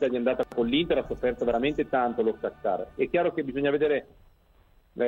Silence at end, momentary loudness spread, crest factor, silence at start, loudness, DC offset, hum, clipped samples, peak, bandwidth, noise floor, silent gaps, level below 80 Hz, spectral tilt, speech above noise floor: 0 s; 5 LU; 16 dB; 0 s; -27 LUFS; under 0.1%; none; under 0.1%; -12 dBFS; 7.2 kHz; -60 dBFS; none; -52 dBFS; -7 dB/octave; 33 dB